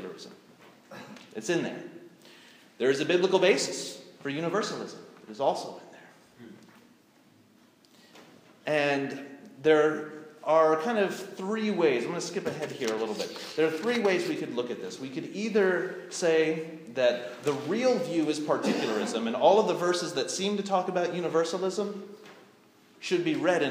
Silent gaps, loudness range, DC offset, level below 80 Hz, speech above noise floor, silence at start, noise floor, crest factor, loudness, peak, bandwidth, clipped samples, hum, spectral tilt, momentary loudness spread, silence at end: none; 8 LU; under 0.1%; -84 dBFS; 33 dB; 0 s; -60 dBFS; 20 dB; -28 LUFS; -8 dBFS; 15.5 kHz; under 0.1%; none; -4.5 dB/octave; 18 LU; 0 s